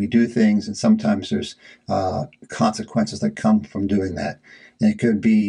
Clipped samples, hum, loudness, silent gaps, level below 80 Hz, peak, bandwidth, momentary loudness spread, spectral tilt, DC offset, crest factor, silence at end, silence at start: under 0.1%; none; -21 LUFS; none; -56 dBFS; -4 dBFS; 10.5 kHz; 11 LU; -6.5 dB/octave; under 0.1%; 16 dB; 0 s; 0 s